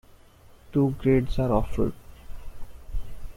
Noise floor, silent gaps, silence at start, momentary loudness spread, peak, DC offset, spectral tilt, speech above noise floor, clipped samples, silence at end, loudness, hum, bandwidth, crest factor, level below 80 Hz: -52 dBFS; none; 0.7 s; 24 LU; -10 dBFS; under 0.1%; -9 dB/octave; 29 dB; under 0.1%; 0 s; -25 LUFS; none; 15.5 kHz; 18 dB; -36 dBFS